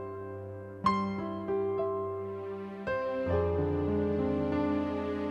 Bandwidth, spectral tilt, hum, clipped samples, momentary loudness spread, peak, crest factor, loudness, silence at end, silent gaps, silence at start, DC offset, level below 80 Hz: 8.2 kHz; -8.5 dB/octave; none; under 0.1%; 10 LU; -14 dBFS; 18 dB; -32 LUFS; 0 s; none; 0 s; under 0.1%; -52 dBFS